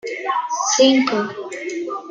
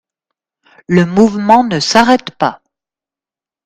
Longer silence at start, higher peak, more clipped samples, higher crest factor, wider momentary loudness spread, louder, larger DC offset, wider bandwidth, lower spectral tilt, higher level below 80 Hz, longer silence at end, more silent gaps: second, 0.05 s vs 0.9 s; about the same, -2 dBFS vs 0 dBFS; second, under 0.1% vs 0.2%; about the same, 16 dB vs 14 dB; first, 13 LU vs 9 LU; second, -19 LUFS vs -11 LUFS; neither; second, 9.2 kHz vs 12.5 kHz; second, -2 dB/octave vs -5 dB/octave; second, -72 dBFS vs -48 dBFS; second, 0 s vs 1.1 s; neither